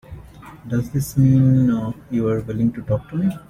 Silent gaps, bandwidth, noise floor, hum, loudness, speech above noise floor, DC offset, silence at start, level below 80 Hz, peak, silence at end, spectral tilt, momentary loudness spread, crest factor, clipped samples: none; 15.5 kHz; -40 dBFS; none; -20 LUFS; 21 dB; under 0.1%; 0.1 s; -44 dBFS; -6 dBFS; 0.1 s; -8.5 dB/octave; 10 LU; 14 dB; under 0.1%